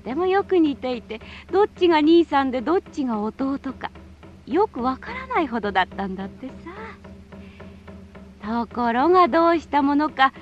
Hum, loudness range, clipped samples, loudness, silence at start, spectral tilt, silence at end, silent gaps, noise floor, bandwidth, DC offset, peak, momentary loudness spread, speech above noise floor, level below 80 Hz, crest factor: none; 8 LU; under 0.1%; -21 LUFS; 0.05 s; -6.5 dB/octave; 0 s; none; -44 dBFS; 8 kHz; under 0.1%; -4 dBFS; 20 LU; 23 dB; -50 dBFS; 18 dB